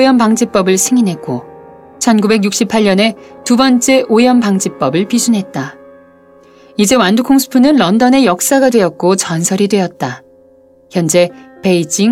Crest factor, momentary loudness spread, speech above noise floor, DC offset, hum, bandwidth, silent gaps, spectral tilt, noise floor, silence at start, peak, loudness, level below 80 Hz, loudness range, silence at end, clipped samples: 12 dB; 12 LU; 34 dB; under 0.1%; none; 16 kHz; none; -4.5 dB/octave; -45 dBFS; 0 s; 0 dBFS; -11 LUFS; -52 dBFS; 3 LU; 0 s; under 0.1%